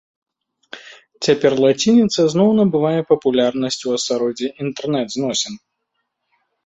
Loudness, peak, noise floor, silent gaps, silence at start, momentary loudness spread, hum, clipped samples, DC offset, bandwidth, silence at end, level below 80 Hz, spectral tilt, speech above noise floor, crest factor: -17 LUFS; -2 dBFS; -74 dBFS; none; 0.75 s; 12 LU; none; under 0.1%; under 0.1%; 8.2 kHz; 1.1 s; -60 dBFS; -5 dB/octave; 57 dB; 16 dB